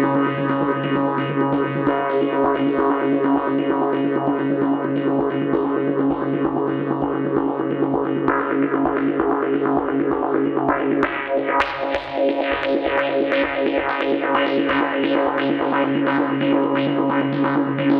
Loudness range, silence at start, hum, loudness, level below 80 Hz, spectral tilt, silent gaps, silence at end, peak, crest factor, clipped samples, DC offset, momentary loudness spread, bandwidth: 1 LU; 0 s; none; -20 LUFS; -52 dBFS; -8.5 dB/octave; none; 0 s; -4 dBFS; 16 dB; under 0.1%; under 0.1%; 2 LU; 5.2 kHz